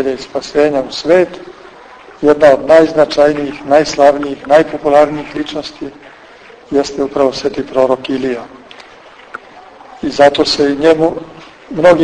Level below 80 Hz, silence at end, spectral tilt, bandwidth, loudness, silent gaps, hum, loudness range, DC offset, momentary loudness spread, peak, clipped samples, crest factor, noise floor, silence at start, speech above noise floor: -46 dBFS; 0 s; -5 dB/octave; 9.6 kHz; -12 LUFS; none; none; 7 LU; under 0.1%; 18 LU; 0 dBFS; 0.8%; 12 dB; -38 dBFS; 0 s; 27 dB